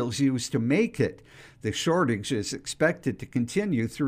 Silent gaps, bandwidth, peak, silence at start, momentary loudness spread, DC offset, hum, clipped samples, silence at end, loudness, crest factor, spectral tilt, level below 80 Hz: none; 15.5 kHz; -8 dBFS; 0 s; 7 LU; under 0.1%; none; under 0.1%; 0 s; -27 LUFS; 18 dB; -5 dB/octave; -58 dBFS